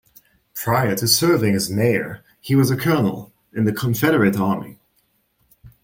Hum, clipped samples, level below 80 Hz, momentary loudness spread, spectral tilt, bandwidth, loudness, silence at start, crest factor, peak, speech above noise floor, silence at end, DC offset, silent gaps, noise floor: none; under 0.1%; -54 dBFS; 16 LU; -5 dB/octave; 17 kHz; -19 LUFS; 0.55 s; 18 dB; -2 dBFS; 47 dB; 0.15 s; under 0.1%; none; -65 dBFS